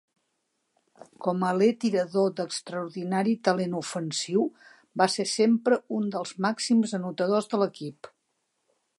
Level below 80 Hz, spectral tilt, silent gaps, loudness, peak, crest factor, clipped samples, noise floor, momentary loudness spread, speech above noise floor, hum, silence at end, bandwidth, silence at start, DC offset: -78 dBFS; -5 dB/octave; none; -27 LUFS; -8 dBFS; 20 dB; under 0.1%; -77 dBFS; 9 LU; 51 dB; none; 0.9 s; 11.5 kHz; 1 s; under 0.1%